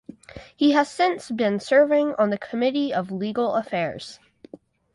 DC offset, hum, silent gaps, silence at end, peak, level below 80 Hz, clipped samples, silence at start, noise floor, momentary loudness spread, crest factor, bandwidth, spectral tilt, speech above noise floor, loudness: under 0.1%; none; none; 0.8 s; -6 dBFS; -62 dBFS; under 0.1%; 0.35 s; -47 dBFS; 12 LU; 18 dB; 11.5 kHz; -5.5 dB/octave; 25 dB; -22 LUFS